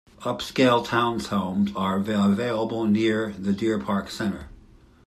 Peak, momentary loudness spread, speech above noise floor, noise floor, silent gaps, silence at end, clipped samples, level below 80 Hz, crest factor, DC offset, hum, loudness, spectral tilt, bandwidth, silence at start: -6 dBFS; 9 LU; 28 dB; -52 dBFS; none; 0.45 s; under 0.1%; -54 dBFS; 18 dB; under 0.1%; none; -24 LUFS; -6 dB/octave; 13.5 kHz; 0.2 s